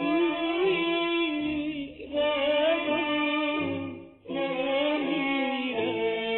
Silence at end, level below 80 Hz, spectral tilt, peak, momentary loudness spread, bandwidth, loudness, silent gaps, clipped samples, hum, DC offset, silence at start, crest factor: 0 s; -60 dBFS; -8.5 dB/octave; -14 dBFS; 9 LU; 4.2 kHz; -27 LUFS; none; under 0.1%; none; under 0.1%; 0 s; 14 dB